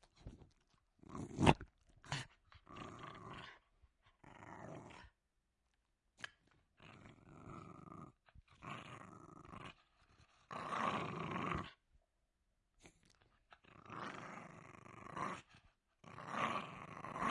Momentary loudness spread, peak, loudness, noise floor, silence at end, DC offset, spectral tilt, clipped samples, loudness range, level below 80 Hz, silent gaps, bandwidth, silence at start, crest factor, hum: 20 LU; -12 dBFS; -45 LUFS; -85 dBFS; 0 s; under 0.1%; -5.5 dB/octave; under 0.1%; 16 LU; -64 dBFS; none; 11.5 kHz; 0.15 s; 36 dB; none